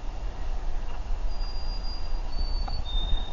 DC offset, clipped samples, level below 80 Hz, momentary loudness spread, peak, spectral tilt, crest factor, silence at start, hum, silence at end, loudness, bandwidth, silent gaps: 1%; under 0.1%; -28 dBFS; 6 LU; -12 dBFS; -4 dB/octave; 14 dB; 0 s; none; 0 s; -35 LUFS; 7 kHz; none